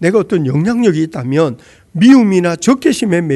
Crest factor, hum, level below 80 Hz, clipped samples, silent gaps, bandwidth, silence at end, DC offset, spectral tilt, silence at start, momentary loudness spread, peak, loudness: 12 dB; none; -50 dBFS; 0.6%; none; 12.5 kHz; 0 s; under 0.1%; -6.5 dB/octave; 0 s; 8 LU; 0 dBFS; -12 LUFS